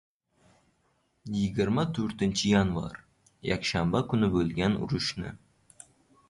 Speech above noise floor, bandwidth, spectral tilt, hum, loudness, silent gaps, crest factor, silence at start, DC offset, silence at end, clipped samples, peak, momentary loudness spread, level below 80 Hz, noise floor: 44 dB; 11.5 kHz; -5.5 dB/octave; none; -28 LUFS; none; 18 dB; 1.25 s; under 0.1%; 0.95 s; under 0.1%; -12 dBFS; 14 LU; -50 dBFS; -71 dBFS